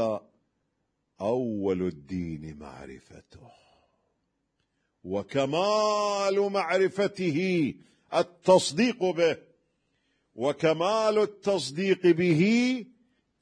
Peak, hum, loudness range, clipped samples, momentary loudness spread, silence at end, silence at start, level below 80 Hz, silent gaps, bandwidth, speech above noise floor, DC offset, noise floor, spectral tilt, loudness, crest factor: -8 dBFS; none; 10 LU; under 0.1%; 14 LU; 0.55 s; 0 s; -64 dBFS; none; 10.5 kHz; 51 dB; under 0.1%; -78 dBFS; -5.5 dB/octave; -26 LUFS; 20 dB